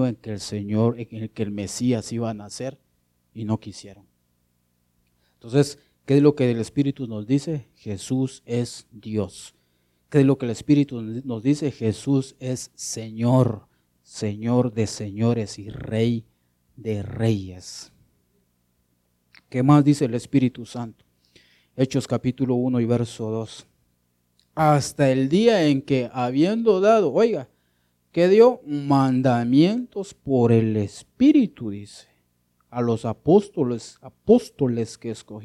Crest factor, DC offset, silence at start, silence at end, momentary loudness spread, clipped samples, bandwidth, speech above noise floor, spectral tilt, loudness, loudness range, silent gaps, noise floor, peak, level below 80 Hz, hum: 20 dB; under 0.1%; 0 s; 0 s; 16 LU; under 0.1%; 13 kHz; 47 dB; -7 dB/octave; -22 LUFS; 9 LU; none; -69 dBFS; -4 dBFS; -58 dBFS; 60 Hz at -50 dBFS